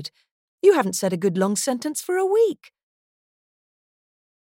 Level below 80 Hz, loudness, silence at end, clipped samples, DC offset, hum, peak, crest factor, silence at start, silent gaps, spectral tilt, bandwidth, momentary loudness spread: -78 dBFS; -21 LUFS; 2 s; under 0.1%; under 0.1%; none; -4 dBFS; 20 dB; 0 s; 0.31-0.58 s; -4.5 dB/octave; 17 kHz; 8 LU